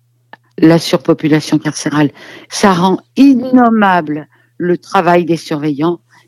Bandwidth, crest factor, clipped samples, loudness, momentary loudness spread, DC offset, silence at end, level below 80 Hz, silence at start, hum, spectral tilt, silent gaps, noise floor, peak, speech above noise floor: 14 kHz; 12 dB; 0.3%; -12 LUFS; 8 LU; under 0.1%; 0.3 s; -54 dBFS; 0.6 s; none; -6 dB/octave; none; -43 dBFS; 0 dBFS; 32 dB